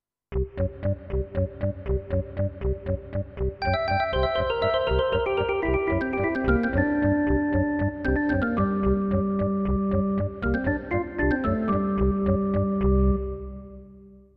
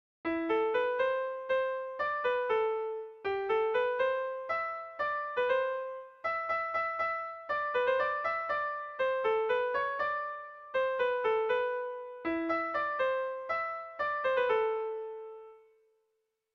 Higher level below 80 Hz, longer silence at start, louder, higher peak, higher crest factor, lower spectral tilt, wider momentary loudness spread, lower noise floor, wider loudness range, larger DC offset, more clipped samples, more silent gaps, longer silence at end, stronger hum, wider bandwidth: first, -34 dBFS vs -70 dBFS; about the same, 0.3 s vs 0.25 s; first, -25 LUFS vs -32 LUFS; first, -8 dBFS vs -18 dBFS; about the same, 18 dB vs 14 dB; first, -10 dB/octave vs -5 dB/octave; about the same, 8 LU vs 8 LU; second, -49 dBFS vs -81 dBFS; about the same, 4 LU vs 2 LU; neither; neither; neither; second, 0.2 s vs 0.95 s; neither; second, 5.2 kHz vs 6.2 kHz